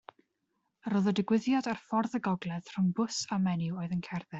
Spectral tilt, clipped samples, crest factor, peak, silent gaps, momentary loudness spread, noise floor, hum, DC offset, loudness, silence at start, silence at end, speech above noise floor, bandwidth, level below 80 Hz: -6 dB/octave; under 0.1%; 16 dB; -16 dBFS; none; 7 LU; -80 dBFS; none; under 0.1%; -32 LUFS; 0.85 s; 0 s; 49 dB; 8 kHz; -70 dBFS